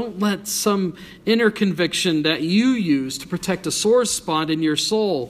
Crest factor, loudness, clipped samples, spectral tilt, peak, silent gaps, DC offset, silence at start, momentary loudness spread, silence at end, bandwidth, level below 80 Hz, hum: 16 dB; -20 LUFS; under 0.1%; -4 dB/octave; -4 dBFS; none; under 0.1%; 0 s; 6 LU; 0 s; 15.5 kHz; -56 dBFS; none